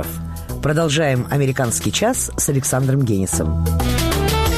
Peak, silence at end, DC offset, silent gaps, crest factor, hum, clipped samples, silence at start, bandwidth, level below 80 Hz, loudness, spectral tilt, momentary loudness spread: -6 dBFS; 0 s; under 0.1%; none; 12 dB; none; under 0.1%; 0 s; 15 kHz; -28 dBFS; -18 LUFS; -4.5 dB/octave; 3 LU